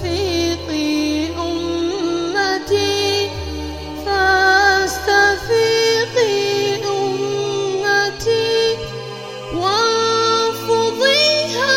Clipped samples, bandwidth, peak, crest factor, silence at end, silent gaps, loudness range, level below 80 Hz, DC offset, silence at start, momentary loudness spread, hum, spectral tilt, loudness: under 0.1%; 16.5 kHz; -2 dBFS; 16 dB; 0 s; none; 4 LU; -40 dBFS; 0.2%; 0 s; 10 LU; none; -3 dB/octave; -17 LUFS